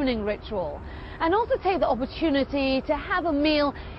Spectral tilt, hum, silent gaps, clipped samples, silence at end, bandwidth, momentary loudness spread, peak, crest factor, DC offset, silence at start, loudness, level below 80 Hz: -8 dB/octave; none; none; under 0.1%; 0 s; 6 kHz; 8 LU; -10 dBFS; 14 dB; under 0.1%; 0 s; -25 LUFS; -42 dBFS